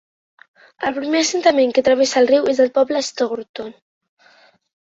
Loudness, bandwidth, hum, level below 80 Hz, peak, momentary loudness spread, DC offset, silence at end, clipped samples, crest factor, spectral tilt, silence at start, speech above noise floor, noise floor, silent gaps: -17 LUFS; 8 kHz; none; -62 dBFS; -2 dBFS; 13 LU; under 0.1%; 1.15 s; under 0.1%; 16 dB; -2 dB/octave; 0.8 s; 36 dB; -53 dBFS; 3.49-3.54 s